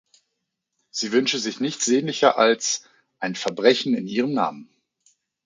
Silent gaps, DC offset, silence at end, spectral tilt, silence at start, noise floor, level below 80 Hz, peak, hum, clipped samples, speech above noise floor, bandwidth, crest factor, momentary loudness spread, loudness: none; under 0.1%; 0.85 s; -3 dB/octave; 0.95 s; -79 dBFS; -74 dBFS; -2 dBFS; none; under 0.1%; 58 dB; 9.6 kHz; 22 dB; 10 LU; -22 LUFS